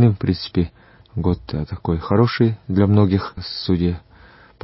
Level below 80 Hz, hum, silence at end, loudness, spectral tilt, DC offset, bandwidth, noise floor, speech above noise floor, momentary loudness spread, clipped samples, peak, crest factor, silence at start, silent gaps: -34 dBFS; none; 0.65 s; -20 LUFS; -12 dB/octave; under 0.1%; 5.8 kHz; -47 dBFS; 28 dB; 11 LU; under 0.1%; -2 dBFS; 18 dB; 0 s; none